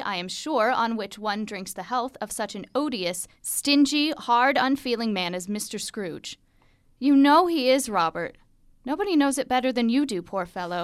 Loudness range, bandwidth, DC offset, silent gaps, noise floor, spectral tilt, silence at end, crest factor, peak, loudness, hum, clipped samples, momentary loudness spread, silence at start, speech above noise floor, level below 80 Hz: 5 LU; 15 kHz; under 0.1%; none; -60 dBFS; -3.5 dB/octave; 0 s; 18 dB; -6 dBFS; -24 LUFS; none; under 0.1%; 12 LU; 0 s; 36 dB; -60 dBFS